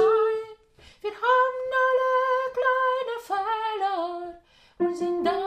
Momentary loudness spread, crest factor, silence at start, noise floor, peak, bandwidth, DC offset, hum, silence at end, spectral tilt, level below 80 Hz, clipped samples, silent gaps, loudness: 12 LU; 14 dB; 0 s; -54 dBFS; -10 dBFS; 14 kHz; under 0.1%; none; 0 s; -4 dB/octave; -64 dBFS; under 0.1%; none; -25 LUFS